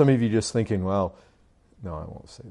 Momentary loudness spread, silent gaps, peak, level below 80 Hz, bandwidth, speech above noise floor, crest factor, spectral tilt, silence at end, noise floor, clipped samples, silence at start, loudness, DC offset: 19 LU; none; -6 dBFS; -52 dBFS; 11 kHz; 35 dB; 18 dB; -6.5 dB/octave; 0 s; -59 dBFS; under 0.1%; 0 s; -25 LUFS; under 0.1%